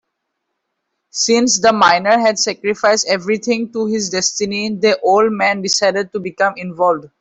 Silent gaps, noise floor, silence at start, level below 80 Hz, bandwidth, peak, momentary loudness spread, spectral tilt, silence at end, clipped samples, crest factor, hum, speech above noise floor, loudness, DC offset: none; -74 dBFS; 1.15 s; -60 dBFS; 8.4 kHz; 0 dBFS; 7 LU; -2.5 dB/octave; 0.15 s; under 0.1%; 16 dB; none; 59 dB; -15 LUFS; under 0.1%